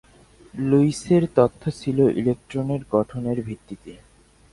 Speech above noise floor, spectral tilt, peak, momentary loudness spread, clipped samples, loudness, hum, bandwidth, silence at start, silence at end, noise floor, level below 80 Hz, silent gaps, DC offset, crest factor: 30 dB; -8 dB/octave; -4 dBFS; 16 LU; under 0.1%; -22 LUFS; none; 11.5 kHz; 0.55 s; 0.55 s; -51 dBFS; -52 dBFS; none; under 0.1%; 20 dB